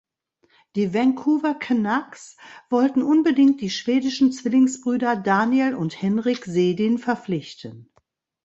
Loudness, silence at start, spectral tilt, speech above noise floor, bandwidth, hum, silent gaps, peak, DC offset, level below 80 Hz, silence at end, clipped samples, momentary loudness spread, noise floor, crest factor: -21 LUFS; 0.75 s; -6 dB/octave; 45 dB; 8 kHz; none; none; -4 dBFS; under 0.1%; -66 dBFS; 0.65 s; under 0.1%; 11 LU; -66 dBFS; 16 dB